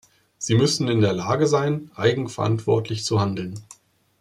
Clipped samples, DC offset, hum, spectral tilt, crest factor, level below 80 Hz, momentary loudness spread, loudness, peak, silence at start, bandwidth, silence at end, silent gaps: under 0.1%; under 0.1%; none; -5.5 dB/octave; 18 dB; -60 dBFS; 9 LU; -22 LUFS; -4 dBFS; 0.4 s; 12.5 kHz; 0.6 s; none